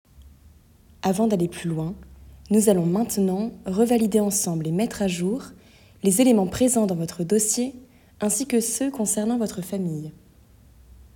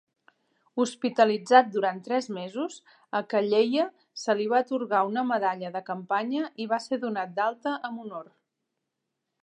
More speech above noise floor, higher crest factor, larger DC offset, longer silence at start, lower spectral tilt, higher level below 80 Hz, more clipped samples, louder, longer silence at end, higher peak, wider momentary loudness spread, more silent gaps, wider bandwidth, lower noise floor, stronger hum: second, 31 dB vs 56 dB; about the same, 18 dB vs 22 dB; neither; second, 0.2 s vs 0.75 s; about the same, -5 dB/octave vs -4.5 dB/octave; first, -52 dBFS vs -86 dBFS; neither; first, -23 LUFS vs -27 LUFS; second, 1.05 s vs 1.2 s; about the same, -6 dBFS vs -4 dBFS; about the same, 10 LU vs 12 LU; neither; first, 18 kHz vs 10.5 kHz; second, -53 dBFS vs -83 dBFS; neither